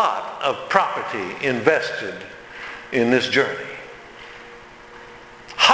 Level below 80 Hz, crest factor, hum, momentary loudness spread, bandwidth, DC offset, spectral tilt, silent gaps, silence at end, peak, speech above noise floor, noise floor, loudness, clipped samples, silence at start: -60 dBFS; 22 dB; none; 23 LU; 8 kHz; under 0.1%; -3.5 dB/octave; none; 0 s; 0 dBFS; 21 dB; -42 dBFS; -21 LUFS; under 0.1%; 0 s